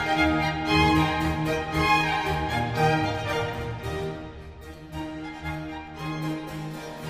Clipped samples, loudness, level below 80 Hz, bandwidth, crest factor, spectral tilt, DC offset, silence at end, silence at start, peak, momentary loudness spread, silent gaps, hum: under 0.1%; -26 LUFS; -40 dBFS; 15.5 kHz; 18 dB; -5.5 dB/octave; under 0.1%; 0 s; 0 s; -8 dBFS; 15 LU; none; none